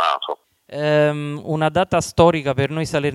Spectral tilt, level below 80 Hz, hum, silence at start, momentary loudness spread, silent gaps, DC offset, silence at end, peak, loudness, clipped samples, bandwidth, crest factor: -5.5 dB/octave; -46 dBFS; none; 0 s; 12 LU; none; under 0.1%; 0 s; -2 dBFS; -19 LUFS; under 0.1%; 13 kHz; 18 dB